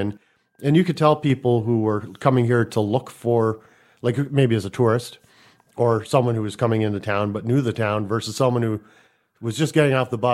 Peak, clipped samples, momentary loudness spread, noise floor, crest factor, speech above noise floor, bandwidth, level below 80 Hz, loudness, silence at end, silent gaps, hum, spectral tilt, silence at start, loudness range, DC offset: -2 dBFS; under 0.1%; 8 LU; -55 dBFS; 18 dB; 35 dB; 13.5 kHz; -60 dBFS; -21 LUFS; 0 s; none; none; -7 dB/octave; 0 s; 2 LU; under 0.1%